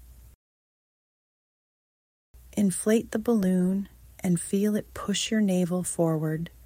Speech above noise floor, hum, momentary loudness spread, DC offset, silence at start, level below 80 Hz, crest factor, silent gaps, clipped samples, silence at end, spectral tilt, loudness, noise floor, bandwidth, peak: over 64 dB; none; 7 LU; under 0.1%; 0.1 s; -56 dBFS; 16 dB; 0.35-2.34 s; under 0.1%; 0.15 s; -5.5 dB/octave; -27 LUFS; under -90 dBFS; 16.5 kHz; -12 dBFS